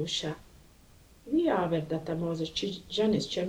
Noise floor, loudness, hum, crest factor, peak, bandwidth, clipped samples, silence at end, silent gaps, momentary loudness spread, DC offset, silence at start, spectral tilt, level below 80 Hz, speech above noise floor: -57 dBFS; -31 LUFS; none; 16 dB; -16 dBFS; 16 kHz; under 0.1%; 0 s; none; 6 LU; under 0.1%; 0 s; -5.5 dB/octave; -58 dBFS; 27 dB